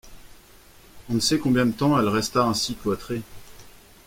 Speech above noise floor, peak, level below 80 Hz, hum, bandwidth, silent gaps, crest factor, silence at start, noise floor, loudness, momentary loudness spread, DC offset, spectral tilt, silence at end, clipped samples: 28 dB; -8 dBFS; -50 dBFS; none; 16.5 kHz; none; 18 dB; 0.05 s; -50 dBFS; -23 LUFS; 11 LU; under 0.1%; -4.5 dB/octave; 0.4 s; under 0.1%